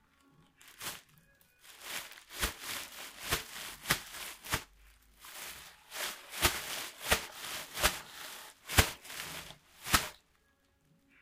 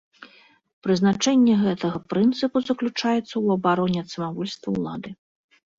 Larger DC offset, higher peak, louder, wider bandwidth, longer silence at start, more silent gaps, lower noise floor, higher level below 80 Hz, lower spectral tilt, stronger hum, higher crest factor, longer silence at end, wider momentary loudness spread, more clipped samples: neither; about the same, -6 dBFS vs -8 dBFS; second, -35 LUFS vs -23 LUFS; first, 16 kHz vs 7.6 kHz; first, 0.6 s vs 0.2 s; second, none vs 0.73-0.82 s; first, -72 dBFS vs -53 dBFS; first, -50 dBFS vs -62 dBFS; second, -2 dB/octave vs -5.5 dB/octave; neither; first, 32 dB vs 16 dB; first, 1.05 s vs 0.65 s; first, 16 LU vs 12 LU; neither